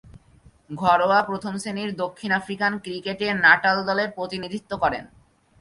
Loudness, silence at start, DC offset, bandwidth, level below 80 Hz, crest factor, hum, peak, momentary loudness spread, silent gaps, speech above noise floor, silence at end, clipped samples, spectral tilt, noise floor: -22 LUFS; 0.05 s; under 0.1%; 11.5 kHz; -56 dBFS; 22 dB; none; -2 dBFS; 14 LU; none; 31 dB; 0.55 s; under 0.1%; -4.5 dB/octave; -54 dBFS